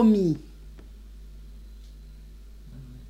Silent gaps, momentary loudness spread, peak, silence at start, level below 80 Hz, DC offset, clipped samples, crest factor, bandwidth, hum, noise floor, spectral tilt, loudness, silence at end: none; 23 LU; -10 dBFS; 0 s; -44 dBFS; under 0.1%; under 0.1%; 18 dB; 8 kHz; none; -45 dBFS; -9 dB/octave; -24 LUFS; 0.05 s